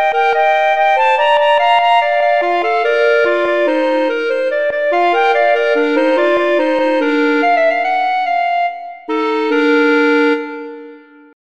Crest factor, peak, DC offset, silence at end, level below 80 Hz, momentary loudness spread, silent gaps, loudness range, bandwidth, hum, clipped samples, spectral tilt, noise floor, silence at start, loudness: 12 dB; -2 dBFS; 1%; 0.55 s; -62 dBFS; 5 LU; none; 2 LU; 8.8 kHz; none; under 0.1%; -3 dB/octave; -38 dBFS; 0 s; -13 LUFS